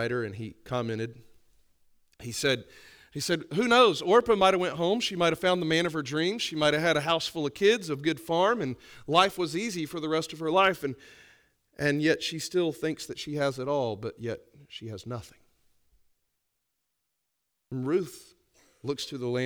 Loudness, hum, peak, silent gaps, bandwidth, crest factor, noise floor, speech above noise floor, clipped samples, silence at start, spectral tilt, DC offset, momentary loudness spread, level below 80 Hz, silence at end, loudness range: -27 LUFS; none; -6 dBFS; none; over 20 kHz; 24 dB; -81 dBFS; 54 dB; under 0.1%; 0 s; -4.5 dB/octave; under 0.1%; 16 LU; -62 dBFS; 0 s; 13 LU